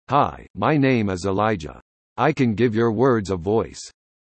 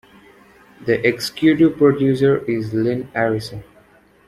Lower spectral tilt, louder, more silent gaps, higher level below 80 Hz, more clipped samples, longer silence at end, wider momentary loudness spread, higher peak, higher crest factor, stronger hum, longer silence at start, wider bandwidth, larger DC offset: about the same, -7 dB/octave vs -6.5 dB/octave; second, -21 LUFS vs -18 LUFS; first, 0.50-0.54 s, 1.82-2.16 s vs none; about the same, -52 dBFS vs -52 dBFS; neither; second, 0.35 s vs 0.65 s; first, 15 LU vs 11 LU; second, -6 dBFS vs -2 dBFS; about the same, 16 dB vs 16 dB; neither; second, 0.1 s vs 0.8 s; second, 8.8 kHz vs 14 kHz; neither